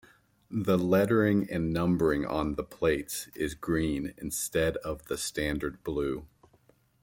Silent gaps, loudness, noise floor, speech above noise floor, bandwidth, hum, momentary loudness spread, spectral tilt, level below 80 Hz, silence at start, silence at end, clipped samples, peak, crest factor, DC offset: none; -30 LUFS; -65 dBFS; 36 dB; 17 kHz; none; 10 LU; -5.5 dB/octave; -50 dBFS; 0.5 s; 0.75 s; under 0.1%; -12 dBFS; 18 dB; under 0.1%